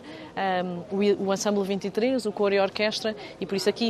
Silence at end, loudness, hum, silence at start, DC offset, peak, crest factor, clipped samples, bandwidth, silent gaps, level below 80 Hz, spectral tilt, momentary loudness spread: 0 s; -26 LUFS; none; 0 s; under 0.1%; -10 dBFS; 16 dB; under 0.1%; 13.5 kHz; none; -66 dBFS; -4.5 dB/octave; 7 LU